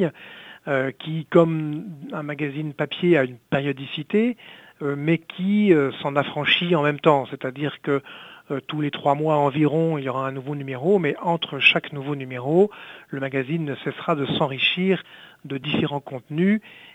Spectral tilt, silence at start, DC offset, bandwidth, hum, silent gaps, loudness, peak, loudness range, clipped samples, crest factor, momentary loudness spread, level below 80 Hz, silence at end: -7.5 dB/octave; 0 s; under 0.1%; 8.8 kHz; none; none; -23 LUFS; -2 dBFS; 3 LU; under 0.1%; 20 dB; 12 LU; -68 dBFS; 0.05 s